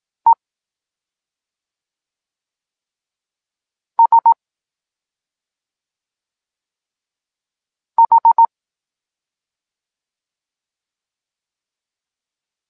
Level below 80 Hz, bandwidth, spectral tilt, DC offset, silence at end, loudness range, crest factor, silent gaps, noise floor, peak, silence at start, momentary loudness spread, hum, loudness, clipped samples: -86 dBFS; 1.8 kHz; -6 dB/octave; under 0.1%; 4.25 s; 6 LU; 18 dB; none; -88 dBFS; -4 dBFS; 0.25 s; 9 LU; none; -14 LUFS; under 0.1%